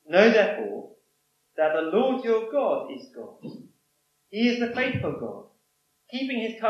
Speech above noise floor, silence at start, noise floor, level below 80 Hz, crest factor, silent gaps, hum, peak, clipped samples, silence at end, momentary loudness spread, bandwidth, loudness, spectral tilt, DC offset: 47 dB; 0.1 s; -71 dBFS; -68 dBFS; 22 dB; none; none; -4 dBFS; under 0.1%; 0 s; 21 LU; 6.8 kHz; -25 LUFS; -6 dB/octave; under 0.1%